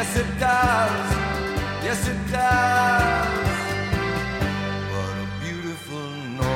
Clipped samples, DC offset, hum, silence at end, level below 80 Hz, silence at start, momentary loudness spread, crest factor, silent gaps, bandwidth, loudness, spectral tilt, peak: under 0.1%; under 0.1%; none; 0 s; -36 dBFS; 0 s; 11 LU; 16 dB; none; 16.5 kHz; -23 LUFS; -5 dB/octave; -6 dBFS